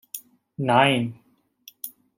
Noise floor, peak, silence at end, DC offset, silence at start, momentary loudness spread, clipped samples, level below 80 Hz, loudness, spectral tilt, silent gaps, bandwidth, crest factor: -53 dBFS; -4 dBFS; 0.3 s; under 0.1%; 0.15 s; 20 LU; under 0.1%; -66 dBFS; -21 LUFS; -5 dB/octave; none; 16.5 kHz; 22 dB